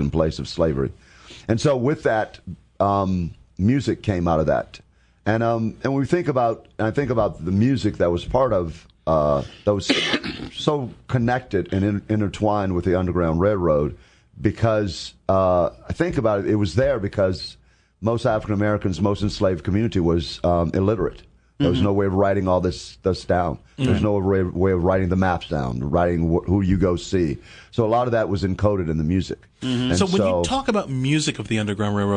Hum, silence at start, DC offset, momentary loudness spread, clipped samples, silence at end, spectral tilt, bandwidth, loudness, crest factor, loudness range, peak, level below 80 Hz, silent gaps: none; 0 s; under 0.1%; 6 LU; under 0.1%; 0 s; -6.5 dB/octave; 10 kHz; -22 LUFS; 20 dB; 2 LU; -2 dBFS; -42 dBFS; none